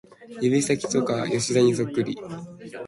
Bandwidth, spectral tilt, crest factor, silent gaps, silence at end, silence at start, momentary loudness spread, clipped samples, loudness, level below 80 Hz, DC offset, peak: 11.5 kHz; -5 dB/octave; 16 dB; none; 0 s; 0.2 s; 17 LU; under 0.1%; -23 LUFS; -62 dBFS; under 0.1%; -8 dBFS